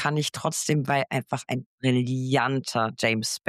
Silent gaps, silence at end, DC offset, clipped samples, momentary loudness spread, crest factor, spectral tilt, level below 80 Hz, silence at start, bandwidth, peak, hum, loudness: 1.66-1.78 s; 0.1 s; under 0.1%; under 0.1%; 5 LU; 16 dB; -4.5 dB/octave; -68 dBFS; 0 s; 14.5 kHz; -10 dBFS; none; -26 LUFS